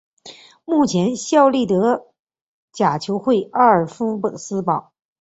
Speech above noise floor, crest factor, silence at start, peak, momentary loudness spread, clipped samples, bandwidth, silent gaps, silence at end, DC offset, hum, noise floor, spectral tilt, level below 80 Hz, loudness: 26 dB; 18 dB; 0.25 s; -2 dBFS; 10 LU; under 0.1%; 8.2 kHz; 2.19-2.25 s, 2.41-2.68 s; 0.4 s; under 0.1%; none; -43 dBFS; -5.5 dB/octave; -60 dBFS; -18 LUFS